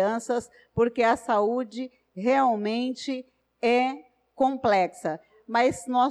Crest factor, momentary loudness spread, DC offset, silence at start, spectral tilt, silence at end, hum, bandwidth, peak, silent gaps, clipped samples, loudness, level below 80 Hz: 14 dB; 12 LU; under 0.1%; 0 s; -5 dB/octave; 0 s; none; 12.5 kHz; -12 dBFS; none; under 0.1%; -26 LUFS; -62 dBFS